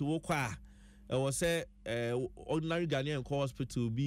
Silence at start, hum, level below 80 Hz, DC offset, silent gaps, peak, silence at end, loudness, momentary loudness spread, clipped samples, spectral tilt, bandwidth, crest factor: 0 s; none; -56 dBFS; under 0.1%; none; -22 dBFS; 0 s; -35 LUFS; 6 LU; under 0.1%; -5.5 dB/octave; 16 kHz; 14 dB